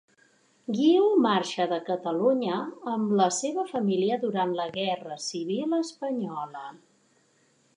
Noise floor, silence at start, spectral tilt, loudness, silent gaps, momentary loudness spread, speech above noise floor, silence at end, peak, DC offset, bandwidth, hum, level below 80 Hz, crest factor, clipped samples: -66 dBFS; 0.7 s; -5 dB/octave; -27 LUFS; none; 12 LU; 39 dB; 1 s; -10 dBFS; under 0.1%; 11 kHz; none; -80 dBFS; 16 dB; under 0.1%